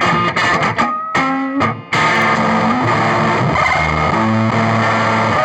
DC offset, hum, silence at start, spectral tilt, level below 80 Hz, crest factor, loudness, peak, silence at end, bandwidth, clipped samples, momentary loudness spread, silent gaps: under 0.1%; none; 0 s; -5.5 dB/octave; -38 dBFS; 12 dB; -14 LUFS; -2 dBFS; 0 s; 11.5 kHz; under 0.1%; 3 LU; none